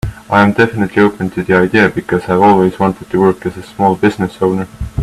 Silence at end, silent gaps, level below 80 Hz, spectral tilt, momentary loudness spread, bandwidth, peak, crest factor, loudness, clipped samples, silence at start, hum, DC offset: 0 s; none; -36 dBFS; -7.5 dB/octave; 9 LU; 13.5 kHz; 0 dBFS; 12 dB; -13 LUFS; under 0.1%; 0.05 s; none; under 0.1%